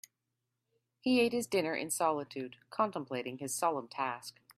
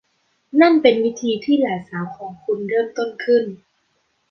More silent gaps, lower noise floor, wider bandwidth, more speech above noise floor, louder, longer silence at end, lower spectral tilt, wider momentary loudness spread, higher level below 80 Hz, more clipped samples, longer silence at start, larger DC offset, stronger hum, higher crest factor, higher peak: neither; first, -86 dBFS vs -67 dBFS; first, 15.5 kHz vs 6.6 kHz; about the same, 52 dB vs 49 dB; second, -34 LUFS vs -19 LUFS; second, 0.25 s vs 0.75 s; second, -3.5 dB/octave vs -5.5 dB/octave; second, 12 LU vs 15 LU; second, -80 dBFS vs -64 dBFS; neither; first, 1.05 s vs 0.55 s; neither; neither; about the same, 18 dB vs 18 dB; second, -16 dBFS vs -2 dBFS